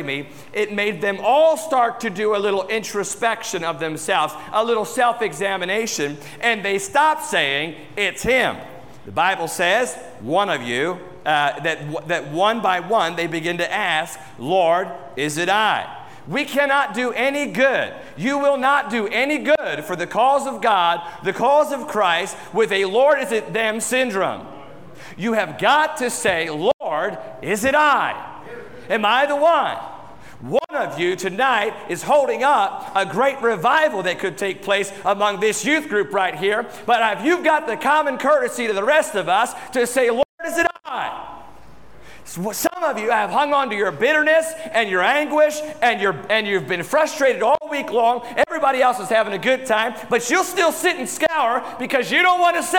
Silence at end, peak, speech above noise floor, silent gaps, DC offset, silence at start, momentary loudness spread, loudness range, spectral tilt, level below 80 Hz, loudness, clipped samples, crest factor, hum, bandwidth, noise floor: 0 s; -4 dBFS; 27 dB; 26.74-26.79 s, 40.25-40.38 s; 0.3%; 0 s; 9 LU; 3 LU; -3 dB/octave; -58 dBFS; -19 LUFS; under 0.1%; 16 dB; none; 19 kHz; -46 dBFS